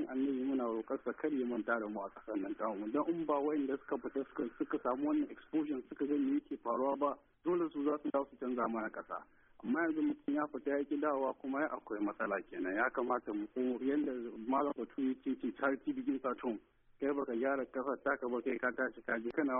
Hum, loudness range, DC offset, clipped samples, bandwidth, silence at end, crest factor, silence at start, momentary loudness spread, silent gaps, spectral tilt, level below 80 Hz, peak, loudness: none; 1 LU; under 0.1%; under 0.1%; 3.7 kHz; 0 s; 16 dB; 0 s; 6 LU; none; -0.5 dB/octave; -74 dBFS; -20 dBFS; -37 LUFS